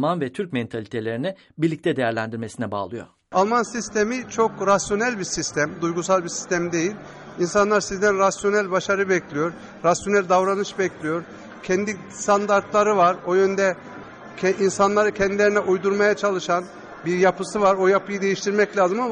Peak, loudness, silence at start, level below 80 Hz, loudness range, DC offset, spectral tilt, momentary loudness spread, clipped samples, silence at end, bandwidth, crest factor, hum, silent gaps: -6 dBFS; -22 LUFS; 0 s; -56 dBFS; 3 LU; under 0.1%; -4.5 dB/octave; 10 LU; under 0.1%; 0 s; 10.5 kHz; 16 dB; none; none